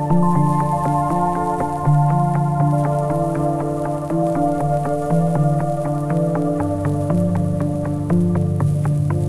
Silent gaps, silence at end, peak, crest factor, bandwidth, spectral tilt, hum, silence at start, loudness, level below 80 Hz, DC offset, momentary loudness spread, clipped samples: none; 0 s; -6 dBFS; 12 dB; 12 kHz; -9 dB/octave; none; 0 s; -19 LUFS; -42 dBFS; under 0.1%; 4 LU; under 0.1%